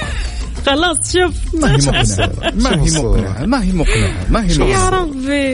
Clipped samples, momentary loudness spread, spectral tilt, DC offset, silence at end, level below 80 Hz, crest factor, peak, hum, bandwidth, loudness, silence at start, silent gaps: under 0.1%; 5 LU; -4.5 dB/octave; under 0.1%; 0 s; -20 dBFS; 12 dB; -2 dBFS; none; 11 kHz; -15 LUFS; 0 s; none